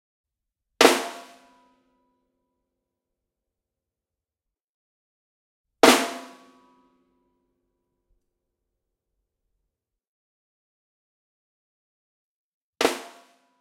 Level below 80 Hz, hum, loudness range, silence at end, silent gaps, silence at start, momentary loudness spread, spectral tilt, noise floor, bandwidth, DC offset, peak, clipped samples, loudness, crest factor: -70 dBFS; none; 8 LU; 0.55 s; 4.64-5.64 s, 10.07-12.73 s; 0.8 s; 20 LU; -1.5 dB/octave; -89 dBFS; 16.5 kHz; under 0.1%; 0 dBFS; under 0.1%; -20 LUFS; 30 dB